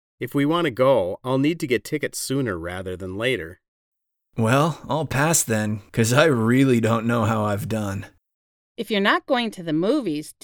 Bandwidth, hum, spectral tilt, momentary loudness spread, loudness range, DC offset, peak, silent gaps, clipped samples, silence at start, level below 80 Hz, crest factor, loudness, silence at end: over 20 kHz; none; -5 dB/octave; 11 LU; 5 LU; under 0.1%; -2 dBFS; 3.68-3.92 s, 8.34-8.75 s; under 0.1%; 0.2 s; -54 dBFS; 20 dB; -22 LUFS; 0.1 s